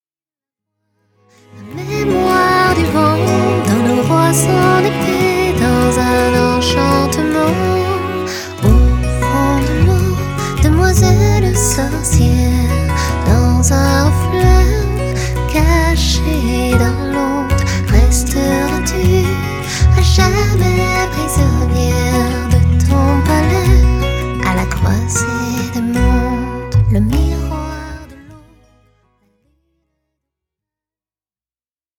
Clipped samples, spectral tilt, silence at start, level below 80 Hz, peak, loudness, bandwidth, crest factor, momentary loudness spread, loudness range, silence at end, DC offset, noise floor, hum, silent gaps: under 0.1%; -5.5 dB/octave; 1.55 s; -18 dBFS; 0 dBFS; -13 LUFS; 18.5 kHz; 14 dB; 7 LU; 4 LU; 3.6 s; under 0.1%; under -90 dBFS; none; none